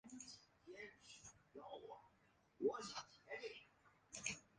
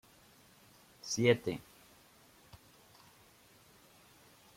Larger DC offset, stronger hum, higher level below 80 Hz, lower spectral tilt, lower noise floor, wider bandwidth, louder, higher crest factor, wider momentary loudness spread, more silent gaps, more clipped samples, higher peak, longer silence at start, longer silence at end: neither; neither; second, -82 dBFS vs -72 dBFS; second, -2.5 dB/octave vs -4.5 dB/octave; first, -77 dBFS vs -63 dBFS; second, 9.6 kHz vs 16.5 kHz; second, -52 LUFS vs -33 LUFS; about the same, 26 dB vs 26 dB; second, 16 LU vs 30 LU; neither; neither; second, -28 dBFS vs -14 dBFS; second, 0.05 s vs 1.05 s; second, 0.15 s vs 2.95 s